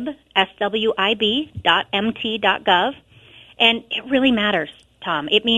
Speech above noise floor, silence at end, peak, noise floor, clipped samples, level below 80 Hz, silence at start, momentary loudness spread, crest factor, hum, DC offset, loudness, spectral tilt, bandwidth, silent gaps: 28 dB; 0 s; 0 dBFS; -47 dBFS; under 0.1%; -56 dBFS; 0 s; 8 LU; 20 dB; none; under 0.1%; -19 LUFS; -5 dB/octave; 11.5 kHz; none